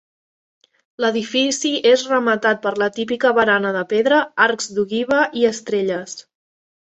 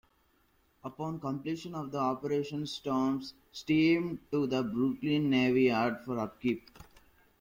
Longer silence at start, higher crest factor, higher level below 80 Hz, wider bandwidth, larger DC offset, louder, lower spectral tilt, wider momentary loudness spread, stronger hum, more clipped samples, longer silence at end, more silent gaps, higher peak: first, 1 s vs 0.85 s; about the same, 18 dB vs 16 dB; about the same, -64 dBFS vs -66 dBFS; second, 8.4 kHz vs 16.5 kHz; neither; first, -18 LUFS vs -31 LUFS; second, -3 dB/octave vs -6.5 dB/octave; second, 7 LU vs 12 LU; neither; neither; about the same, 0.65 s vs 0.6 s; neither; first, -2 dBFS vs -16 dBFS